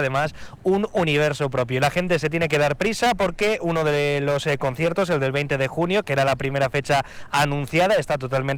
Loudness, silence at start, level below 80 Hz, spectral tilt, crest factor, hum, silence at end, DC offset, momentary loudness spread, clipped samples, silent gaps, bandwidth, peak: -22 LUFS; 0 s; -46 dBFS; -5.5 dB/octave; 16 dB; none; 0 s; 0.3%; 3 LU; under 0.1%; none; 18 kHz; -6 dBFS